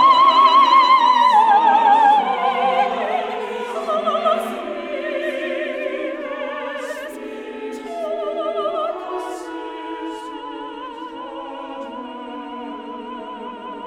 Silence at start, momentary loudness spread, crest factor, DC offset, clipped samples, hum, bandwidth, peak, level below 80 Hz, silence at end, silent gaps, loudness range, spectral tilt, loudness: 0 s; 20 LU; 16 dB; under 0.1%; under 0.1%; none; 14 kHz; -2 dBFS; -62 dBFS; 0 s; none; 16 LU; -3 dB/octave; -18 LUFS